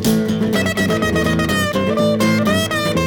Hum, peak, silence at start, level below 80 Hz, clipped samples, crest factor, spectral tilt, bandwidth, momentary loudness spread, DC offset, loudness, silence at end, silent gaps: none; -4 dBFS; 0 s; -38 dBFS; under 0.1%; 12 dB; -5 dB/octave; over 20 kHz; 2 LU; under 0.1%; -17 LUFS; 0 s; none